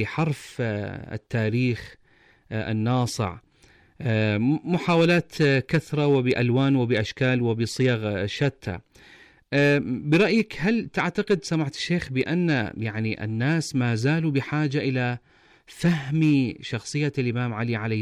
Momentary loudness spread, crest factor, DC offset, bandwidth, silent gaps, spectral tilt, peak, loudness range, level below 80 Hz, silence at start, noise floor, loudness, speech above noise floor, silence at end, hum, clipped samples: 8 LU; 12 dB; under 0.1%; 14 kHz; none; -6.5 dB/octave; -12 dBFS; 5 LU; -56 dBFS; 0 s; -58 dBFS; -24 LUFS; 34 dB; 0 s; none; under 0.1%